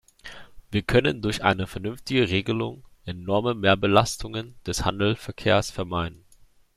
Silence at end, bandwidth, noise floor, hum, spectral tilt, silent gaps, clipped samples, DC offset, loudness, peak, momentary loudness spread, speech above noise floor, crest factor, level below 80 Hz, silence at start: 0.65 s; 14.5 kHz; -55 dBFS; none; -5 dB/octave; none; under 0.1%; under 0.1%; -24 LUFS; -2 dBFS; 13 LU; 31 dB; 22 dB; -46 dBFS; 0.25 s